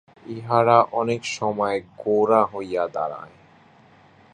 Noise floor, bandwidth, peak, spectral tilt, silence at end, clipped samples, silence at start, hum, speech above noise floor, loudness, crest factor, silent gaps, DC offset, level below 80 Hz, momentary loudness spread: -53 dBFS; 9.8 kHz; -2 dBFS; -5.5 dB/octave; 1.05 s; under 0.1%; 0.25 s; none; 31 dB; -22 LUFS; 22 dB; none; under 0.1%; -64 dBFS; 13 LU